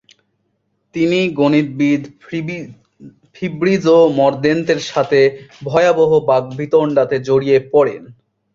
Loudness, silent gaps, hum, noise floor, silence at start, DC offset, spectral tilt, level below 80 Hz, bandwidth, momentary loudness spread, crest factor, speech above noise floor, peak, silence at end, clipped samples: -15 LUFS; none; none; -67 dBFS; 0.95 s; under 0.1%; -6.5 dB/octave; -56 dBFS; 7.6 kHz; 14 LU; 14 dB; 52 dB; -2 dBFS; 0.4 s; under 0.1%